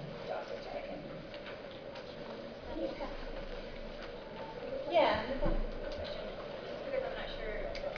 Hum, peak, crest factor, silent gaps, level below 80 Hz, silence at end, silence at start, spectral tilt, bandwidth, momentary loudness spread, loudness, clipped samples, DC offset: none; -18 dBFS; 20 dB; none; -46 dBFS; 0 s; 0 s; -3 dB/octave; 5.4 kHz; 13 LU; -39 LUFS; under 0.1%; under 0.1%